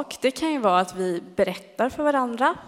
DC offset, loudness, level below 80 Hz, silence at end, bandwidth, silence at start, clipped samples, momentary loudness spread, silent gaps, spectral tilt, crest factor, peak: under 0.1%; -24 LUFS; -58 dBFS; 0 s; 16 kHz; 0 s; under 0.1%; 6 LU; none; -4.5 dB/octave; 18 dB; -6 dBFS